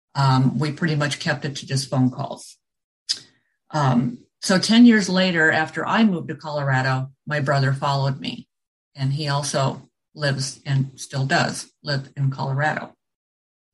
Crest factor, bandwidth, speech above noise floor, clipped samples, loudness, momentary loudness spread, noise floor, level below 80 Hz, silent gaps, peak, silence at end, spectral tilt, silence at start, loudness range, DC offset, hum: 18 dB; 12 kHz; 35 dB; under 0.1%; -21 LUFS; 12 LU; -55 dBFS; -62 dBFS; 2.84-3.06 s, 8.68-8.91 s; -4 dBFS; 0.85 s; -5.5 dB/octave; 0.15 s; 7 LU; under 0.1%; none